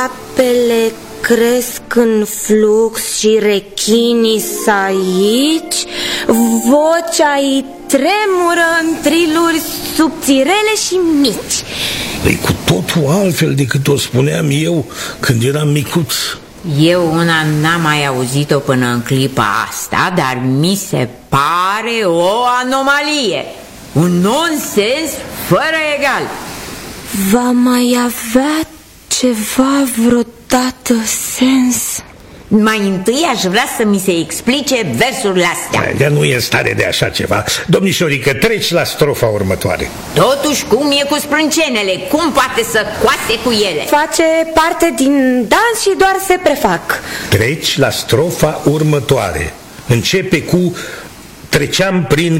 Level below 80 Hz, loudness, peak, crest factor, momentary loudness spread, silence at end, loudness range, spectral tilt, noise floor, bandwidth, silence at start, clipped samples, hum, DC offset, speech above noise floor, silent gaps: -40 dBFS; -13 LUFS; 0 dBFS; 12 dB; 6 LU; 0 s; 2 LU; -4.5 dB/octave; -33 dBFS; 16.5 kHz; 0 s; under 0.1%; none; under 0.1%; 20 dB; none